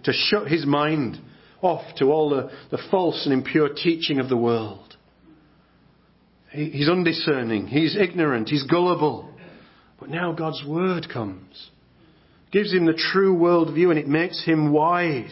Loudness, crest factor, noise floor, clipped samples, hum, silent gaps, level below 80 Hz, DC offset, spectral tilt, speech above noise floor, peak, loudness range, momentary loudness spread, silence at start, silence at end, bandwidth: -22 LUFS; 18 dB; -58 dBFS; under 0.1%; none; none; -62 dBFS; under 0.1%; -10 dB/octave; 37 dB; -6 dBFS; 6 LU; 12 LU; 0.05 s; 0 s; 5.8 kHz